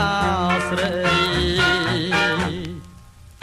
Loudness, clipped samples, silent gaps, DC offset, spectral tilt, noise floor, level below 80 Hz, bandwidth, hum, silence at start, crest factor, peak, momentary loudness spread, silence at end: -19 LUFS; under 0.1%; none; under 0.1%; -4.5 dB/octave; -44 dBFS; -38 dBFS; 15 kHz; none; 0 s; 16 dB; -6 dBFS; 10 LU; 0.15 s